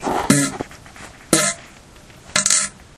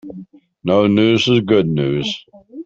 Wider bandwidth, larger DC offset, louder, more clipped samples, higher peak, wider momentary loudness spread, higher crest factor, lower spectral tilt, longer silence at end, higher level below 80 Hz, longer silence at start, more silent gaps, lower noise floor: first, 16.5 kHz vs 7.8 kHz; neither; about the same, -17 LUFS vs -15 LUFS; neither; about the same, 0 dBFS vs -2 dBFS; first, 22 LU vs 14 LU; first, 22 dB vs 14 dB; second, -2.5 dB/octave vs -6.5 dB/octave; first, 0.15 s vs 0 s; about the same, -48 dBFS vs -52 dBFS; about the same, 0 s vs 0.05 s; neither; first, -44 dBFS vs -38 dBFS